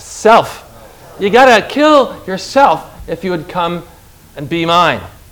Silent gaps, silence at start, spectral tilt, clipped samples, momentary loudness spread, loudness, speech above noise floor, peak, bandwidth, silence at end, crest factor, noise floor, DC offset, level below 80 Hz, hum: none; 0 s; -4.5 dB/octave; 1%; 16 LU; -12 LUFS; 25 dB; 0 dBFS; over 20 kHz; 0.2 s; 12 dB; -37 dBFS; under 0.1%; -42 dBFS; none